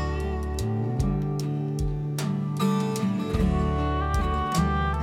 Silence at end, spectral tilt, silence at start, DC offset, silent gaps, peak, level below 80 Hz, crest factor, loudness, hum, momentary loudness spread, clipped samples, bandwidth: 0 s; -6.5 dB/octave; 0 s; under 0.1%; none; -12 dBFS; -32 dBFS; 14 dB; -27 LUFS; none; 4 LU; under 0.1%; 16 kHz